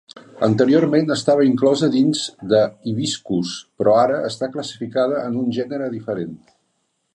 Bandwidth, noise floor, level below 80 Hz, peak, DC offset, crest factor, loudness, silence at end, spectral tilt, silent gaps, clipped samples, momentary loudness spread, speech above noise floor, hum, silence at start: 11 kHz; -70 dBFS; -60 dBFS; -2 dBFS; under 0.1%; 16 dB; -19 LUFS; 0.8 s; -5.5 dB/octave; none; under 0.1%; 11 LU; 51 dB; none; 0.15 s